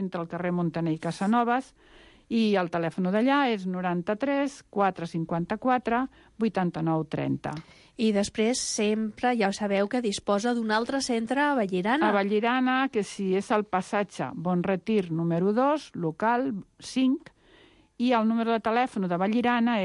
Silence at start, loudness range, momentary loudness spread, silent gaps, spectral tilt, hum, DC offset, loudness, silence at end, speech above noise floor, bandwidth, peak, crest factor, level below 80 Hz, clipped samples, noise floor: 0 s; 3 LU; 7 LU; none; -5.5 dB/octave; none; under 0.1%; -27 LUFS; 0 s; 31 dB; 11.5 kHz; -12 dBFS; 14 dB; -62 dBFS; under 0.1%; -57 dBFS